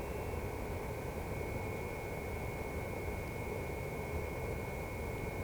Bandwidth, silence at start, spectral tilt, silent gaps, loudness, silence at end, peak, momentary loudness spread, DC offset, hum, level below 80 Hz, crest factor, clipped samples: over 20 kHz; 0 s; -6 dB/octave; none; -41 LUFS; 0 s; -26 dBFS; 1 LU; under 0.1%; none; -48 dBFS; 14 dB; under 0.1%